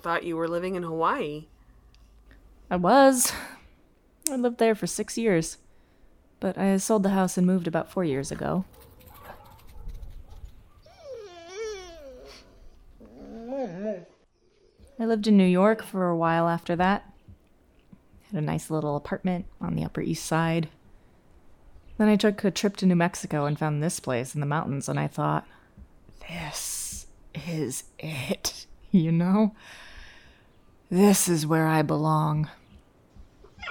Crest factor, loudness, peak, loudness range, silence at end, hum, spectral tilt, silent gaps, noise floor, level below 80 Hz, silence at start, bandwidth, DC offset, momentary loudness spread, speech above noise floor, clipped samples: 26 dB; -26 LUFS; -2 dBFS; 14 LU; 0 s; none; -5.5 dB/octave; none; -63 dBFS; -52 dBFS; 0.05 s; over 20 kHz; under 0.1%; 21 LU; 38 dB; under 0.1%